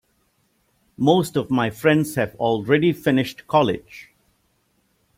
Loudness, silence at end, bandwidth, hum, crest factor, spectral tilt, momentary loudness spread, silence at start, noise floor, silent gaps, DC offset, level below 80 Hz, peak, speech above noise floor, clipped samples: -20 LUFS; 1.15 s; 16.5 kHz; none; 18 dB; -6 dB/octave; 6 LU; 1 s; -66 dBFS; none; under 0.1%; -58 dBFS; -4 dBFS; 46 dB; under 0.1%